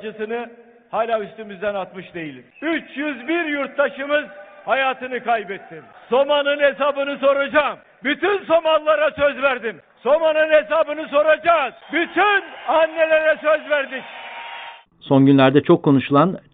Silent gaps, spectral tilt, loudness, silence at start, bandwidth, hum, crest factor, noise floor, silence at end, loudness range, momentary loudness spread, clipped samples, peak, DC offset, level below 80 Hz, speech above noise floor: none; -10.5 dB/octave; -19 LUFS; 0 s; 4.5 kHz; none; 18 dB; -38 dBFS; 0.15 s; 6 LU; 16 LU; under 0.1%; -2 dBFS; under 0.1%; -60 dBFS; 19 dB